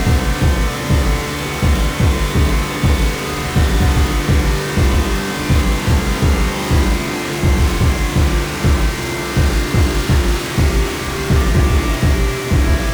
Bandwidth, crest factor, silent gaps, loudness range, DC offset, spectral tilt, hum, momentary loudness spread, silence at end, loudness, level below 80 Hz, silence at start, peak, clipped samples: over 20 kHz; 12 dB; none; 1 LU; under 0.1%; -5.5 dB/octave; none; 4 LU; 0 s; -16 LUFS; -18 dBFS; 0 s; -2 dBFS; under 0.1%